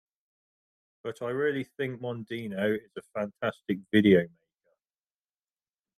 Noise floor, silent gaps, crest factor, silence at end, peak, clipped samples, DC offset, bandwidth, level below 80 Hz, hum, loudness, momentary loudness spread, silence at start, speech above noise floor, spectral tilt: under -90 dBFS; none; 24 dB; 1.7 s; -8 dBFS; under 0.1%; under 0.1%; 13.5 kHz; -72 dBFS; none; -29 LUFS; 16 LU; 1.05 s; over 62 dB; -7.5 dB/octave